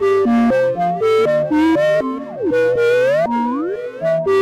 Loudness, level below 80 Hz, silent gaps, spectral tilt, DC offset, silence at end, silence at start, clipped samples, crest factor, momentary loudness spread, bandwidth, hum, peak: -16 LUFS; -50 dBFS; none; -6.5 dB/octave; under 0.1%; 0 s; 0 s; under 0.1%; 6 dB; 8 LU; 14 kHz; none; -10 dBFS